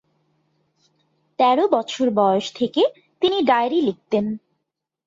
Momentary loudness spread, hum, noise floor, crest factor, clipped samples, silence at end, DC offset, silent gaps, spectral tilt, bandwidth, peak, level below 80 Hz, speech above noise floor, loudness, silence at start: 6 LU; none; -79 dBFS; 18 dB; under 0.1%; 0.7 s; under 0.1%; none; -5.5 dB/octave; 7.8 kHz; -4 dBFS; -66 dBFS; 60 dB; -20 LUFS; 1.4 s